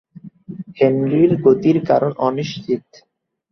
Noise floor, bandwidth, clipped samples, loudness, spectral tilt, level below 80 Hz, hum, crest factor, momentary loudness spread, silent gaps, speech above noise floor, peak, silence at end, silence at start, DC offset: -36 dBFS; 6.4 kHz; under 0.1%; -17 LUFS; -8 dB/octave; -58 dBFS; none; 16 dB; 16 LU; none; 20 dB; -2 dBFS; 0.7 s; 0.25 s; under 0.1%